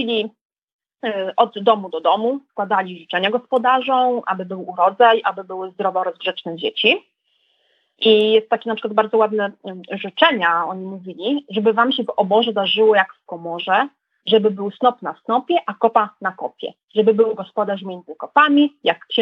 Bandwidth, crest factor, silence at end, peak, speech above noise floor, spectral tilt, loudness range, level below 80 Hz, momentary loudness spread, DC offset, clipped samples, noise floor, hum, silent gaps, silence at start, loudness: 5.4 kHz; 18 dB; 0 s; 0 dBFS; 47 dB; -7 dB/octave; 2 LU; -82 dBFS; 14 LU; under 0.1%; under 0.1%; -65 dBFS; none; 0.41-0.50 s, 0.63-0.79 s, 16.84-16.88 s; 0 s; -18 LUFS